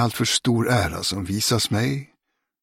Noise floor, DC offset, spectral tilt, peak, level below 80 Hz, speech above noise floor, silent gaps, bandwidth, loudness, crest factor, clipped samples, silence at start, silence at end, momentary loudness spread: -73 dBFS; under 0.1%; -4 dB/octave; -6 dBFS; -48 dBFS; 52 dB; none; 16.5 kHz; -22 LUFS; 18 dB; under 0.1%; 0 s; 0.55 s; 5 LU